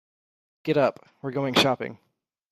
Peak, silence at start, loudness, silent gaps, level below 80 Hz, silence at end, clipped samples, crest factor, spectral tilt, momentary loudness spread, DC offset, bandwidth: -8 dBFS; 0.65 s; -24 LUFS; none; -66 dBFS; 0.55 s; under 0.1%; 20 dB; -4.5 dB/octave; 15 LU; under 0.1%; 15 kHz